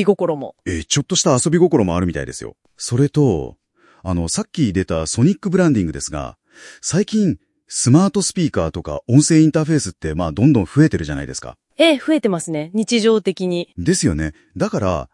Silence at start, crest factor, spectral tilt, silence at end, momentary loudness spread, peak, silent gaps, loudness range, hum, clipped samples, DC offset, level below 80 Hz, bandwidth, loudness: 0 s; 18 dB; -5.5 dB/octave; 0.1 s; 13 LU; 0 dBFS; none; 3 LU; none; under 0.1%; under 0.1%; -42 dBFS; 12 kHz; -18 LUFS